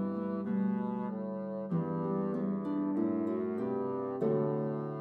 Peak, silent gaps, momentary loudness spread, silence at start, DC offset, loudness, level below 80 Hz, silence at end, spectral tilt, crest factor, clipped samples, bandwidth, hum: -20 dBFS; none; 5 LU; 0 s; under 0.1%; -34 LUFS; -80 dBFS; 0 s; -11.5 dB/octave; 14 dB; under 0.1%; 4.4 kHz; none